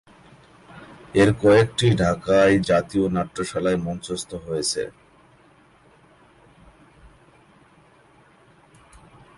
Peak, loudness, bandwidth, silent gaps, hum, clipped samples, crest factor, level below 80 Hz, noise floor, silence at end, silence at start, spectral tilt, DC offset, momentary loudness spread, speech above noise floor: -6 dBFS; -21 LUFS; 11.5 kHz; none; none; under 0.1%; 18 dB; -48 dBFS; -55 dBFS; 4.5 s; 0.75 s; -5.5 dB/octave; under 0.1%; 13 LU; 35 dB